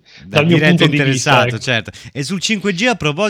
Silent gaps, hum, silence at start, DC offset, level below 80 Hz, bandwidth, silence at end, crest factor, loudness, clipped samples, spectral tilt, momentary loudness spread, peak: none; none; 0.25 s; under 0.1%; -48 dBFS; 14.5 kHz; 0 s; 14 dB; -14 LUFS; under 0.1%; -4.5 dB/octave; 9 LU; 0 dBFS